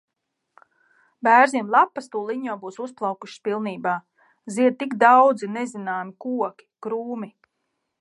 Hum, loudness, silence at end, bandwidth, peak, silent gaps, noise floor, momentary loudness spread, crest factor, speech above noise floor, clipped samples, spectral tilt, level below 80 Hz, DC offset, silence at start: none; -22 LUFS; 0.7 s; 11.5 kHz; -2 dBFS; none; -79 dBFS; 16 LU; 22 dB; 58 dB; under 0.1%; -5 dB/octave; -80 dBFS; under 0.1%; 1.25 s